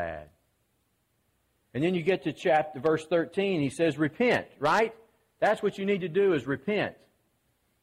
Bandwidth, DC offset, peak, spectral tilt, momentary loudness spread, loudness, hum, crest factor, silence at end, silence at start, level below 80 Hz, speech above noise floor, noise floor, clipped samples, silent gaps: 13 kHz; under 0.1%; -12 dBFS; -6 dB/octave; 5 LU; -28 LUFS; none; 16 dB; 0.9 s; 0 s; -64 dBFS; 46 dB; -73 dBFS; under 0.1%; none